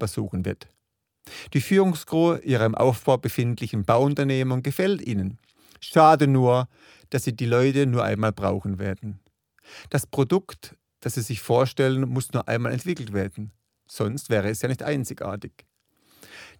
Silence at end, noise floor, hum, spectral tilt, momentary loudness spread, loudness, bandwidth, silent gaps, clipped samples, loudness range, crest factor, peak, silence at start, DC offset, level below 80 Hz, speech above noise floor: 0.15 s; -63 dBFS; none; -6.5 dB/octave; 15 LU; -23 LUFS; 19 kHz; none; under 0.1%; 7 LU; 20 dB; -4 dBFS; 0 s; under 0.1%; -58 dBFS; 40 dB